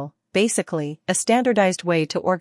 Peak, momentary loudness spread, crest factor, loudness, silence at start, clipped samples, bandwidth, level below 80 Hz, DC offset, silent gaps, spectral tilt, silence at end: -4 dBFS; 7 LU; 16 dB; -21 LUFS; 0 s; under 0.1%; 12 kHz; -72 dBFS; under 0.1%; none; -4 dB/octave; 0 s